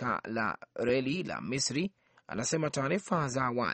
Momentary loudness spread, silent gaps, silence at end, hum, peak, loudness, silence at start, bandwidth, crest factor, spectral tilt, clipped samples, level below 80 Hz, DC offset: 5 LU; none; 0 s; none; -14 dBFS; -32 LUFS; 0 s; 8.8 kHz; 18 dB; -4.5 dB/octave; under 0.1%; -64 dBFS; under 0.1%